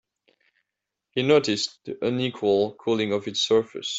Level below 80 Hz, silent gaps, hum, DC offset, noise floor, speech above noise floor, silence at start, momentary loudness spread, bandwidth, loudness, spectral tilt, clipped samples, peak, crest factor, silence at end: -66 dBFS; none; none; under 0.1%; -85 dBFS; 61 dB; 1.15 s; 8 LU; 8.2 kHz; -24 LUFS; -4.5 dB/octave; under 0.1%; -6 dBFS; 20 dB; 0 s